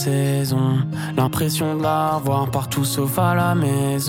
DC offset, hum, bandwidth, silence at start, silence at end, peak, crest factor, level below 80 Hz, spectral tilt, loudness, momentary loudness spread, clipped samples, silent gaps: under 0.1%; none; 17 kHz; 0 s; 0 s; -6 dBFS; 14 dB; -50 dBFS; -6 dB/octave; -20 LUFS; 3 LU; under 0.1%; none